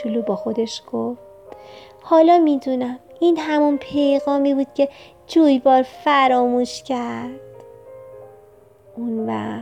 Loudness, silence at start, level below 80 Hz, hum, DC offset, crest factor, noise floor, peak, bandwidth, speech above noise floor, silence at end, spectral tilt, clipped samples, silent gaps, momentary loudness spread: -19 LUFS; 0 s; -62 dBFS; none; under 0.1%; 16 dB; -49 dBFS; -4 dBFS; 10 kHz; 30 dB; 0 s; -5.5 dB/octave; under 0.1%; none; 14 LU